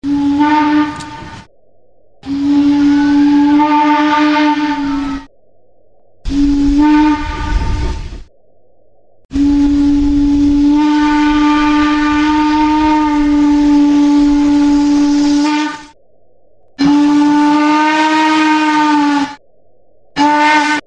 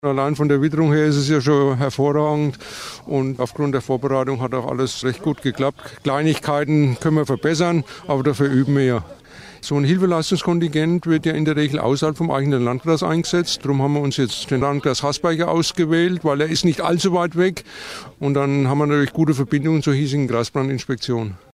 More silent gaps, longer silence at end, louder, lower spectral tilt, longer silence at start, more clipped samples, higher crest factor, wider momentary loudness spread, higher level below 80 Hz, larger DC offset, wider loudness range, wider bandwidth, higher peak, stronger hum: first, 9.25-9.29 s vs none; second, 0.05 s vs 0.2 s; first, -11 LUFS vs -19 LUFS; about the same, -5 dB/octave vs -6 dB/octave; about the same, 0 s vs 0.05 s; neither; about the same, 10 dB vs 12 dB; first, 11 LU vs 7 LU; first, -28 dBFS vs -52 dBFS; neither; about the same, 5 LU vs 3 LU; second, 8.8 kHz vs 14 kHz; first, 0 dBFS vs -6 dBFS; neither